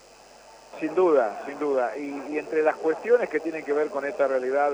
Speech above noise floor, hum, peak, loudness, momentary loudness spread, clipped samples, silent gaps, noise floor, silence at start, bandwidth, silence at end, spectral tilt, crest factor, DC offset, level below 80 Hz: 26 dB; none; -8 dBFS; -25 LUFS; 10 LU; under 0.1%; none; -50 dBFS; 0.45 s; 19.5 kHz; 0 s; -5.5 dB/octave; 16 dB; under 0.1%; -70 dBFS